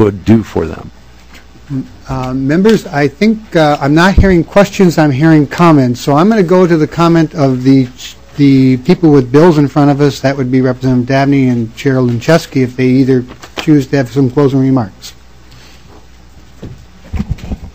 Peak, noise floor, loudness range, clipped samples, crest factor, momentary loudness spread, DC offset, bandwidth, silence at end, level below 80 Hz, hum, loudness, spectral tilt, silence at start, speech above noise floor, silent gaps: 0 dBFS; -38 dBFS; 6 LU; 2%; 10 dB; 14 LU; 1%; 16 kHz; 0.05 s; -28 dBFS; none; -10 LUFS; -7.5 dB/octave; 0 s; 29 dB; none